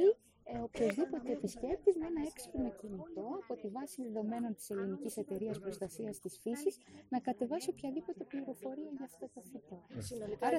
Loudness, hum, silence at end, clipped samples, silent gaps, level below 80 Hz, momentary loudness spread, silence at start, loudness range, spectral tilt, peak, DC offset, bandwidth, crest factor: -40 LUFS; none; 0 s; under 0.1%; none; -64 dBFS; 12 LU; 0 s; 4 LU; -5.5 dB/octave; -18 dBFS; under 0.1%; 16.5 kHz; 20 dB